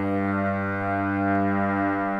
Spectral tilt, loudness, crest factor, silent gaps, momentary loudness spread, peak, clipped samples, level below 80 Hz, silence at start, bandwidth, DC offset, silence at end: -9.5 dB/octave; -25 LUFS; 12 dB; none; 3 LU; -12 dBFS; under 0.1%; -58 dBFS; 0 s; 5.4 kHz; under 0.1%; 0 s